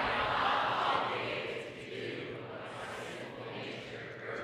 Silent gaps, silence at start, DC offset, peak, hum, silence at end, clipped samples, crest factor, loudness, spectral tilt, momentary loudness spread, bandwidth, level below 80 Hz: none; 0 s; under 0.1%; -18 dBFS; none; 0 s; under 0.1%; 18 dB; -36 LUFS; -4.5 dB/octave; 13 LU; 15 kHz; -64 dBFS